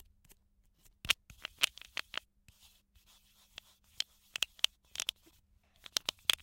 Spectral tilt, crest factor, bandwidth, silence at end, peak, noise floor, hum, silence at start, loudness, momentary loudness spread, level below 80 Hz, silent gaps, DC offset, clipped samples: 1.5 dB/octave; 38 dB; 17 kHz; 0.1 s; -4 dBFS; -70 dBFS; none; 1.05 s; -36 LUFS; 21 LU; -66 dBFS; none; under 0.1%; under 0.1%